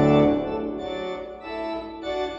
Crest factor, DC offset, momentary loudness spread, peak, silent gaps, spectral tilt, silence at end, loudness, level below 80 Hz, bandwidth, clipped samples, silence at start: 18 dB; under 0.1%; 13 LU; -6 dBFS; none; -8 dB/octave; 0 s; -26 LUFS; -48 dBFS; 7.4 kHz; under 0.1%; 0 s